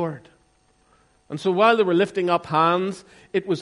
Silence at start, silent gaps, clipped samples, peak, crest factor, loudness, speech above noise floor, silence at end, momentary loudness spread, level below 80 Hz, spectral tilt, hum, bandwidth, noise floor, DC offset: 0 s; none; under 0.1%; -6 dBFS; 18 dB; -21 LUFS; 40 dB; 0 s; 16 LU; -66 dBFS; -6 dB/octave; none; 11.5 kHz; -62 dBFS; under 0.1%